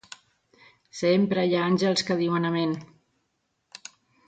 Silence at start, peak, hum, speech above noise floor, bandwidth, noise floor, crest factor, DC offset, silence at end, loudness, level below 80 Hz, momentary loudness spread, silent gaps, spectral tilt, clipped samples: 0.95 s; -10 dBFS; none; 52 dB; 9.2 kHz; -76 dBFS; 16 dB; under 0.1%; 1.4 s; -24 LUFS; -70 dBFS; 21 LU; none; -5.5 dB/octave; under 0.1%